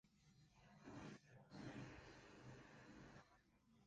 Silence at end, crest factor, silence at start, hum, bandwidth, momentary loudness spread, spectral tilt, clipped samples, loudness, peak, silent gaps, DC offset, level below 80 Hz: 0 s; 18 dB; 0.05 s; none; 9 kHz; 8 LU; -5.5 dB/octave; under 0.1%; -61 LUFS; -44 dBFS; none; under 0.1%; -78 dBFS